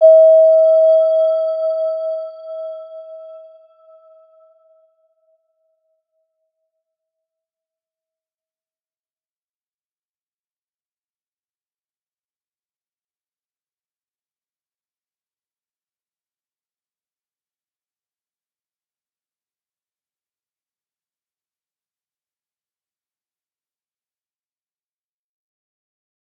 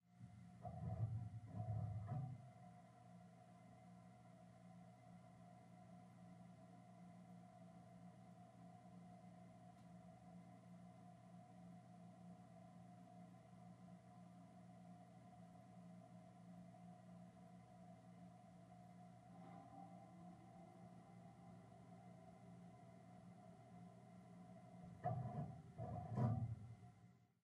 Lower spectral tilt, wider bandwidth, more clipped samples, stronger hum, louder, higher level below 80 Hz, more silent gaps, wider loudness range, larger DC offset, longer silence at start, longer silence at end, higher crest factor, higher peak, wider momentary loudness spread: second, -3.5 dB/octave vs -9 dB/octave; second, 4.9 kHz vs 11 kHz; neither; neither; first, -13 LUFS vs -57 LUFS; second, under -90 dBFS vs -76 dBFS; neither; first, 24 LU vs 12 LU; neither; about the same, 0 s vs 0.05 s; first, 22.85 s vs 0.2 s; second, 20 dB vs 26 dB; first, -2 dBFS vs -30 dBFS; first, 26 LU vs 16 LU